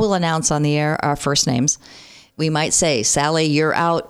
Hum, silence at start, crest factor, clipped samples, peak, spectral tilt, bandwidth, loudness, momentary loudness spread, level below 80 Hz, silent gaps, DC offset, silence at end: none; 0 s; 14 dB; under 0.1%; -4 dBFS; -3.5 dB/octave; 14.5 kHz; -18 LUFS; 4 LU; -46 dBFS; none; under 0.1%; 0 s